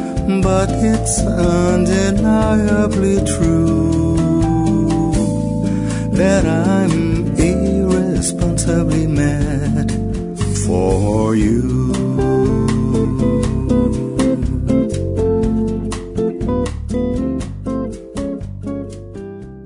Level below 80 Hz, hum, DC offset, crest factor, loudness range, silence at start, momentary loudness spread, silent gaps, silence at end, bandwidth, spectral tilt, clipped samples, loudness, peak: -26 dBFS; none; under 0.1%; 14 dB; 5 LU; 0 s; 9 LU; none; 0 s; 11 kHz; -6.5 dB/octave; under 0.1%; -16 LUFS; -2 dBFS